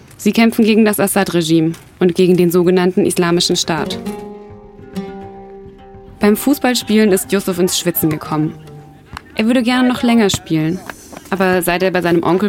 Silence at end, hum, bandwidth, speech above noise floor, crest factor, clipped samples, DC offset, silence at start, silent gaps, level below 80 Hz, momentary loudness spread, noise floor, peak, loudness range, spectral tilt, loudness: 0 s; none; 17 kHz; 24 dB; 14 dB; under 0.1%; under 0.1%; 0.2 s; none; -46 dBFS; 18 LU; -37 dBFS; -2 dBFS; 6 LU; -5 dB/octave; -14 LUFS